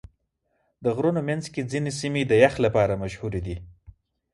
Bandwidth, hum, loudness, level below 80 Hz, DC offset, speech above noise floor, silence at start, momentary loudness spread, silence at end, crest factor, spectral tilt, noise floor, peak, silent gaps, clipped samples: 11.5 kHz; none; -24 LUFS; -48 dBFS; under 0.1%; 50 dB; 0.8 s; 12 LU; 0.65 s; 22 dB; -6 dB/octave; -73 dBFS; -4 dBFS; none; under 0.1%